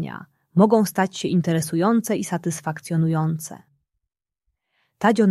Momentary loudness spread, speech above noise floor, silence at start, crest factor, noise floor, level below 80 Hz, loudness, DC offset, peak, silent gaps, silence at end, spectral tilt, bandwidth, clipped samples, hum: 12 LU; 62 dB; 0 s; 20 dB; -83 dBFS; -66 dBFS; -21 LUFS; under 0.1%; -2 dBFS; none; 0 s; -6.5 dB/octave; 14.5 kHz; under 0.1%; none